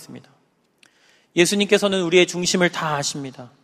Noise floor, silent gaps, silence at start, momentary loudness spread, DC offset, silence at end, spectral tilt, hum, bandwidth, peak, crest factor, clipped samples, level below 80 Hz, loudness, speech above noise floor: -59 dBFS; none; 0 s; 10 LU; under 0.1%; 0.15 s; -3.5 dB/octave; none; 15 kHz; 0 dBFS; 22 dB; under 0.1%; -62 dBFS; -19 LUFS; 39 dB